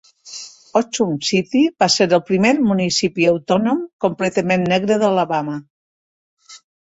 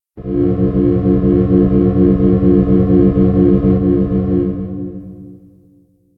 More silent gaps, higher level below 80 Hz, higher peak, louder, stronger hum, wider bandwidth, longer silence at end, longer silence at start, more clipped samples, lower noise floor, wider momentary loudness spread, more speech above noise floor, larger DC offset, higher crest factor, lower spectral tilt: first, 3.93-3.99 s, 5.70-6.37 s vs none; second, -58 dBFS vs -26 dBFS; about the same, -2 dBFS vs 0 dBFS; second, -17 LUFS vs -13 LUFS; neither; first, 8 kHz vs 3.4 kHz; second, 0.25 s vs 0.8 s; about the same, 0.25 s vs 0.15 s; neither; second, -37 dBFS vs -51 dBFS; about the same, 10 LU vs 11 LU; second, 20 dB vs 40 dB; neither; about the same, 16 dB vs 12 dB; second, -4.5 dB/octave vs -13 dB/octave